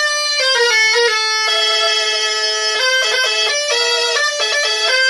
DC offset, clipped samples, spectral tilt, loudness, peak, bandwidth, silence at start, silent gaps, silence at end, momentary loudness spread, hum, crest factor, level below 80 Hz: 0.1%; under 0.1%; 4 dB/octave; -13 LUFS; -2 dBFS; 12 kHz; 0 s; none; 0 s; 4 LU; none; 14 dB; -64 dBFS